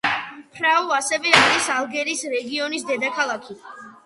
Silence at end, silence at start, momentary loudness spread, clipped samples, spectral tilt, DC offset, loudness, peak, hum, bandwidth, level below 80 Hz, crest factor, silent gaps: 0.15 s; 0.05 s; 19 LU; under 0.1%; -1.5 dB/octave; under 0.1%; -20 LUFS; 0 dBFS; none; 11.5 kHz; -68 dBFS; 22 dB; none